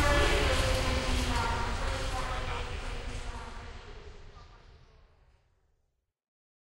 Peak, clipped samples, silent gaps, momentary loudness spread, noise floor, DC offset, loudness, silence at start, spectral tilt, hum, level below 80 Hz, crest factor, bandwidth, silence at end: -14 dBFS; under 0.1%; none; 21 LU; -78 dBFS; under 0.1%; -31 LUFS; 0 s; -4 dB/octave; none; -36 dBFS; 18 dB; 16 kHz; 1.85 s